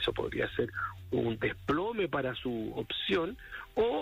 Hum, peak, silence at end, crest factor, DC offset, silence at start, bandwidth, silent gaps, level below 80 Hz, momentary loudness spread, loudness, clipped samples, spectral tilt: none; -20 dBFS; 0 s; 14 dB; under 0.1%; 0 s; 16 kHz; none; -54 dBFS; 6 LU; -33 LUFS; under 0.1%; -6.5 dB/octave